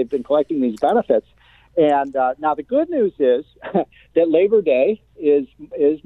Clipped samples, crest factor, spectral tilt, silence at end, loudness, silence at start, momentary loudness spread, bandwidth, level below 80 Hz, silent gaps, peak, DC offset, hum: under 0.1%; 14 dB; -8 dB/octave; 0.1 s; -19 LUFS; 0 s; 7 LU; 7.4 kHz; -58 dBFS; none; -4 dBFS; under 0.1%; none